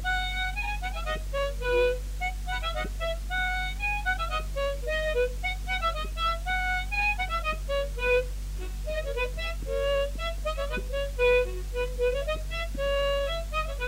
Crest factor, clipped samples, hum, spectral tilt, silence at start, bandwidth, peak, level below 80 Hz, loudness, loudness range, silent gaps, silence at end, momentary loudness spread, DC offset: 16 dB; under 0.1%; none; -4 dB/octave; 0 s; 16 kHz; -14 dBFS; -34 dBFS; -29 LUFS; 2 LU; none; 0 s; 7 LU; under 0.1%